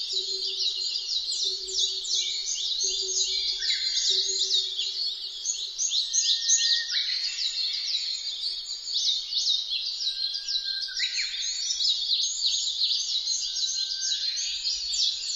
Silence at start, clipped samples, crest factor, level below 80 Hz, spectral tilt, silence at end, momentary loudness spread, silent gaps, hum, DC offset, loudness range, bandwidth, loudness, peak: 0 s; under 0.1%; 18 dB; -64 dBFS; 4 dB/octave; 0 s; 6 LU; none; none; under 0.1%; 2 LU; 15.5 kHz; -25 LUFS; -10 dBFS